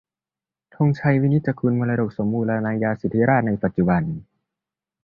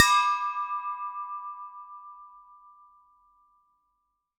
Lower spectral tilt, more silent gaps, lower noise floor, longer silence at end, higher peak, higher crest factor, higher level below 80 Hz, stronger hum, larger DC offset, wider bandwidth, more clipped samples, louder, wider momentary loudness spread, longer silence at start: first, -11 dB/octave vs 4.5 dB/octave; neither; first, under -90 dBFS vs -78 dBFS; second, 0.8 s vs 2 s; second, -4 dBFS vs 0 dBFS; second, 18 dB vs 30 dB; first, -50 dBFS vs -76 dBFS; neither; neither; second, 5.4 kHz vs 16 kHz; neither; first, -21 LUFS vs -28 LUFS; second, 5 LU vs 24 LU; first, 0.8 s vs 0 s